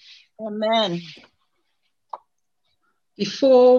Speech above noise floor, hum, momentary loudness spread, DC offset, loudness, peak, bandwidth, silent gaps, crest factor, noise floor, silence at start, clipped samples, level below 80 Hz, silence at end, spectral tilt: 57 dB; none; 24 LU; under 0.1%; -21 LUFS; -6 dBFS; 7 kHz; none; 16 dB; -75 dBFS; 0.4 s; under 0.1%; -72 dBFS; 0 s; -5.5 dB/octave